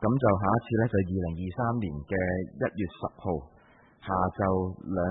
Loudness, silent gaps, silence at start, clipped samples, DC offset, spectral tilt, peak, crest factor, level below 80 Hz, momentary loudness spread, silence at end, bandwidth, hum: -29 LUFS; none; 0 s; under 0.1%; under 0.1%; -12.5 dB/octave; -10 dBFS; 18 dB; -52 dBFS; 9 LU; 0 s; 3.9 kHz; none